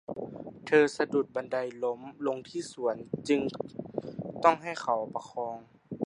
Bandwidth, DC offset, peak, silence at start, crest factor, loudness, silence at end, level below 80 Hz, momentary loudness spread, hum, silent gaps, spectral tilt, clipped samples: 11 kHz; under 0.1%; -6 dBFS; 0.1 s; 24 dB; -31 LUFS; 0 s; -70 dBFS; 14 LU; none; none; -5.5 dB/octave; under 0.1%